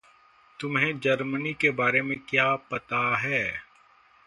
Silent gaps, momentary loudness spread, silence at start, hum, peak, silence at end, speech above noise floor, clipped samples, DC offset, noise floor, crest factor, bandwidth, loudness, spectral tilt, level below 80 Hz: none; 7 LU; 0.6 s; none; -6 dBFS; 0.65 s; 32 dB; under 0.1%; under 0.1%; -59 dBFS; 22 dB; 11.5 kHz; -25 LUFS; -5.5 dB/octave; -64 dBFS